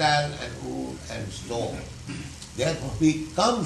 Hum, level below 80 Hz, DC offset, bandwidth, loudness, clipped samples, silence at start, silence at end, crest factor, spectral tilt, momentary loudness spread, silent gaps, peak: none; -46 dBFS; under 0.1%; 12 kHz; -28 LUFS; under 0.1%; 0 s; 0 s; 20 dB; -4.5 dB/octave; 13 LU; none; -8 dBFS